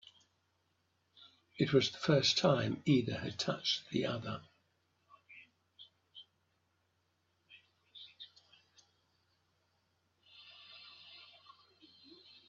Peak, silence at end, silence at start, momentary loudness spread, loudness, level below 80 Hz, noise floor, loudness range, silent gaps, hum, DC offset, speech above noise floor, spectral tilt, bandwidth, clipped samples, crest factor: -16 dBFS; 1.25 s; 1.6 s; 26 LU; -33 LUFS; -76 dBFS; -79 dBFS; 25 LU; none; none; under 0.1%; 46 dB; -4 dB/octave; 7.8 kHz; under 0.1%; 24 dB